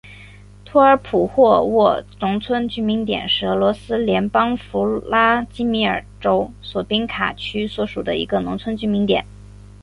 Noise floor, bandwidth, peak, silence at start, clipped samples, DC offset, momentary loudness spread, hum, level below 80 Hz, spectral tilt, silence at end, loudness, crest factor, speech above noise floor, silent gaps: -42 dBFS; 11 kHz; -2 dBFS; 0.05 s; under 0.1%; under 0.1%; 9 LU; 50 Hz at -40 dBFS; -44 dBFS; -7 dB/octave; 0.6 s; -19 LUFS; 18 dB; 23 dB; none